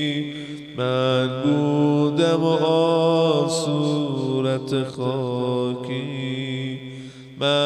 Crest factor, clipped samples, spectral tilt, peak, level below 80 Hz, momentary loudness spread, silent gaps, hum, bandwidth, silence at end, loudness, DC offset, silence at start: 14 dB; under 0.1%; -6 dB/octave; -6 dBFS; -62 dBFS; 12 LU; none; none; 12 kHz; 0 s; -22 LUFS; under 0.1%; 0 s